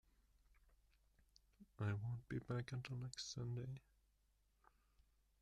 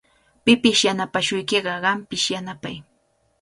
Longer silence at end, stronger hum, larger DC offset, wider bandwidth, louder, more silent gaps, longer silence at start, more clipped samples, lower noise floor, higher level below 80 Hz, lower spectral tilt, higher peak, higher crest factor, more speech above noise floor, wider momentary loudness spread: first, 1.65 s vs 0.6 s; first, 50 Hz at -70 dBFS vs none; neither; about the same, 11 kHz vs 11.5 kHz; second, -48 LUFS vs -20 LUFS; neither; first, 1.6 s vs 0.45 s; neither; first, -80 dBFS vs -65 dBFS; second, -72 dBFS vs -58 dBFS; first, -5.5 dB/octave vs -3 dB/octave; second, -34 dBFS vs -2 dBFS; about the same, 18 dB vs 20 dB; second, 33 dB vs 44 dB; second, 5 LU vs 17 LU